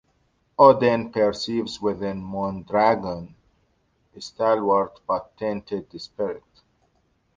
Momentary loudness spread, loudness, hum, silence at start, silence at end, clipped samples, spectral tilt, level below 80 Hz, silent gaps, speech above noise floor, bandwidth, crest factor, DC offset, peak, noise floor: 18 LU; -23 LUFS; none; 0.6 s; 1 s; under 0.1%; -6 dB/octave; -56 dBFS; none; 45 dB; 7.6 kHz; 22 dB; under 0.1%; -2 dBFS; -67 dBFS